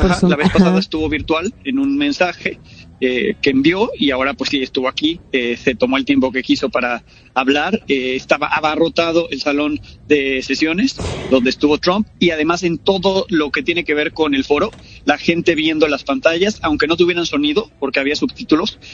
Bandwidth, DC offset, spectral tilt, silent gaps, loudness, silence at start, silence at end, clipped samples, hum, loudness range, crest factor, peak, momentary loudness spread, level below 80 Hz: 9.2 kHz; under 0.1%; -5 dB/octave; none; -16 LUFS; 0 s; 0 s; under 0.1%; none; 1 LU; 16 dB; 0 dBFS; 5 LU; -38 dBFS